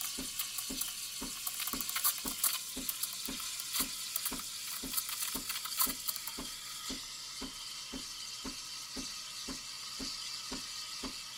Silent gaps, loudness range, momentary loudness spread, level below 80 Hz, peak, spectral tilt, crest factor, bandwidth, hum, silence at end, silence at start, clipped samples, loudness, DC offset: none; 6 LU; 9 LU; -60 dBFS; -14 dBFS; 0 dB/octave; 26 dB; 18 kHz; none; 0 s; 0 s; under 0.1%; -36 LUFS; under 0.1%